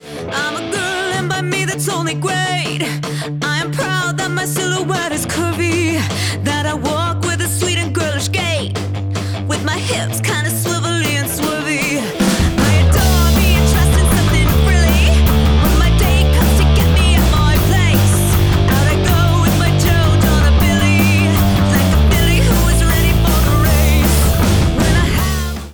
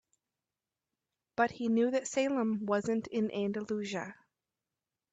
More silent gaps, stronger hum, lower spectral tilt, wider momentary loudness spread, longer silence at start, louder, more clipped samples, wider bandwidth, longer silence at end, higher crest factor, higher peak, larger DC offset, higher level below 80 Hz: neither; neither; about the same, -5 dB/octave vs -5 dB/octave; second, 6 LU vs 9 LU; second, 0.05 s vs 1.4 s; first, -14 LUFS vs -33 LUFS; neither; first, over 20 kHz vs 8.8 kHz; second, 0 s vs 1 s; second, 10 dB vs 20 dB; first, -4 dBFS vs -16 dBFS; neither; first, -18 dBFS vs -76 dBFS